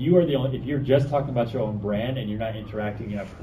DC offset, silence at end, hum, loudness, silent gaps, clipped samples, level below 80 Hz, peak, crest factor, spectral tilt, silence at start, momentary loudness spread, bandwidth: under 0.1%; 0 s; none; -25 LUFS; none; under 0.1%; -46 dBFS; -6 dBFS; 18 dB; -9 dB/octave; 0 s; 10 LU; 13.5 kHz